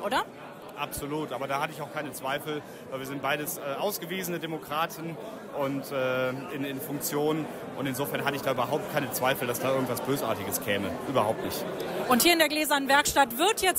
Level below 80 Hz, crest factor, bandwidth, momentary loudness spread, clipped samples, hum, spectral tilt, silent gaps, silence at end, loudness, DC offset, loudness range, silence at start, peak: -60 dBFS; 20 dB; 16 kHz; 13 LU; under 0.1%; none; -3.5 dB/octave; none; 0 s; -28 LUFS; under 0.1%; 7 LU; 0 s; -10 dBFS